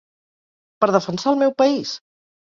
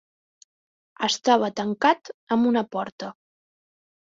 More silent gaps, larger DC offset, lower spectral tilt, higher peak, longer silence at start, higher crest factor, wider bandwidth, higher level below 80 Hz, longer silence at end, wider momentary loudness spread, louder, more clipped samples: second, none vs 2.14-2.27 s, 2.92-2.98 s; neither; first, -5.5 dB/octave vs -4 dB/octave; about the same, -2 dBFS vs -4 dBFS; second, 0.8 s vs 1 s; about the same, 20 dB vs 20 dB; about the same, 7.6 kHz vs 7.8 kHz; about the same, -66 dBFS vs -70 dBFS; second, 0.55 s vs 1 s; about the same, 11 LU vs 12 LU; first, -19 LUFS vs -23 LUFS; neither